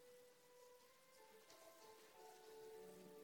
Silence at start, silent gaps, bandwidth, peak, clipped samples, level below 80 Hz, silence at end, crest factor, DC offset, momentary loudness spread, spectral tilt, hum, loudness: 0 s; none; 17.5 kHz; -50 dBFS; under 0.1%; under -90 dBFS; 0 s; 14 dB; under 0.1%; 8 LU; -3 dB/octave; none; -64 LUFS